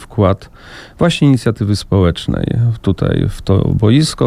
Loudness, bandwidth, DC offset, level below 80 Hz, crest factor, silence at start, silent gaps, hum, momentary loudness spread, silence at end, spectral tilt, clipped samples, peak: -14 LUFS; 13.5 kHz; under 0.1%; -32 dBFS; 12 dB; 0 s; none; none; 6 LU; 0 s; -7 dB/octave; under 0.1%; 0 dBFS